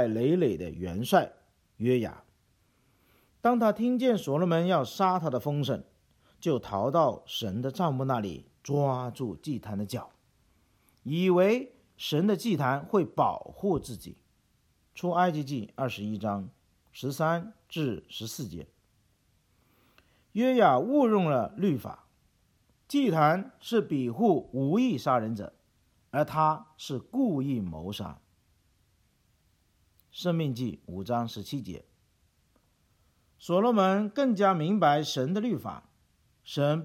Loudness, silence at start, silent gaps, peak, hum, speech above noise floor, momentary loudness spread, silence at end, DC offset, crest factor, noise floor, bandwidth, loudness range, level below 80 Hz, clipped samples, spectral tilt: -28 LUFS; 0 s; none; -8 dBFS; none; 41 dB; 14 LU; 0 s; under 0.1%; 20 dB; -69 dBFS; 16.5 kHz; 8 LU; -64 dBFS; under 0.1%; -6.5 dB/octave